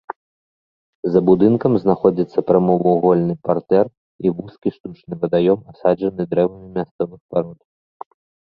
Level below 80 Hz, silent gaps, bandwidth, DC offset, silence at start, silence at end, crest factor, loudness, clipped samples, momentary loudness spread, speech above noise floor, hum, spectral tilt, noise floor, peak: -54 dBFS; 0.16-1.03 s, 3.97-4.19 s, 4.80-4.84 s, 6.91-6.99 s, 7.21-7.29 s; 5.2 kHz; under 0.1%; 0.1 s; 0.95 s; 18 dB; -18 LUFS; under 0.1%; 12 LU; over 73 dB; none; -11 dB/octave; under -90 dBFS; -2 dBFS